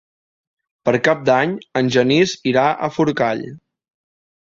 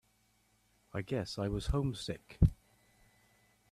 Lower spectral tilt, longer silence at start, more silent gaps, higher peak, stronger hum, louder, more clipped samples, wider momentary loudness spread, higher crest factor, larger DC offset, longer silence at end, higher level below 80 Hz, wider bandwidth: second, -5.5 dB/octave vs -7 dB/octave; about the same, 0.85 s vs 0.95 s; neither; first, -2 dBFS vs -14 dBFS; neither; first, -17 LUFS vs -36 LUFS; neither; second, 6 LU vs 12 LU; about the same, 18 dB vs 22 dB; neither; second, 0.95 s vs 1.2 s; second, -58 dBFS vs -44 dBFS; second, 7.8 kHz vs 13 kHz